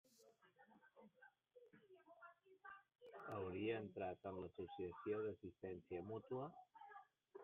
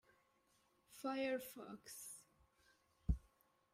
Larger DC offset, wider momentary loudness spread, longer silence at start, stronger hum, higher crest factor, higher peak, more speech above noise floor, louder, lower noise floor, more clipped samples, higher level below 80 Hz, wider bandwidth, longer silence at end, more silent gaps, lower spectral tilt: neither; first, 21 LU vs 12 LU; second, 0.2 s vs 0.9 s; neither; about the same, 18 dB vs 22 dB; second, -34 dBFS vs -26 dBFS; second, 24 dB vs 33 dB; second, -50 LUFS vs -47 LUFS; second, -74 dBFS vs -78 dBFS; neither; second, -86 dBFS vs -54 dBFS; second, 4 kHz vs 16 kHz; second, 0 s vs 0.55 s; neither; about the same, -5.5 dB/octave vs -5.5 dB/octave